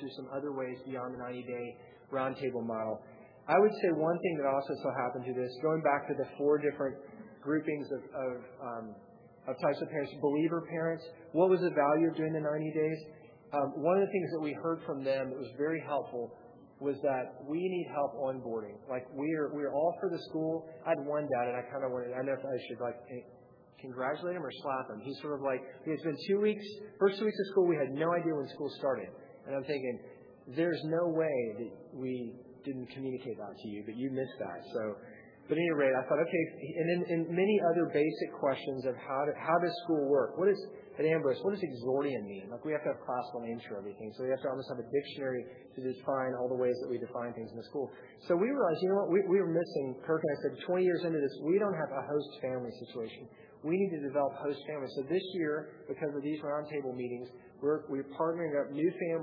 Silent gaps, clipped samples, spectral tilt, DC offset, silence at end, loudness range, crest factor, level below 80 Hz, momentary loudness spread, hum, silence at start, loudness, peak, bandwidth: none; under 0.1%; -5.5 dB/octave; under 0.1%; 0 s; 6 LU; 20 dB; -82 dBFS; 13 LU; none; 0 s; -34 LUFS; -14 dBFS; 5.2 kHz